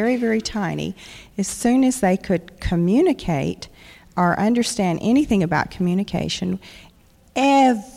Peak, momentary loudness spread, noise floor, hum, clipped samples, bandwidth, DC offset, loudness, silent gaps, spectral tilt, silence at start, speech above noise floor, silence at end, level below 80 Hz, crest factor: -6 dBFS; 12 LU; -52 dBFS; none; under 0.1%; 15.5 kHz; under 0.1%; -20 LUFS; none; -5.5 dB/octave; 0 s; 32 dB; 0 s; -42 dBFS; 14 dB